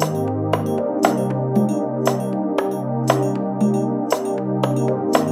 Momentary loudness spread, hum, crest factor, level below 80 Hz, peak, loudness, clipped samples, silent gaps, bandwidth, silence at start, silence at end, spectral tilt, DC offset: 3 LU; none; 18 dB; -64 dBFS; 0 dBFS; -20 LUFS; under 0.1%; none; 15 kHz; 0 s; 0 s; -6.5 dB/octave; under 0.1%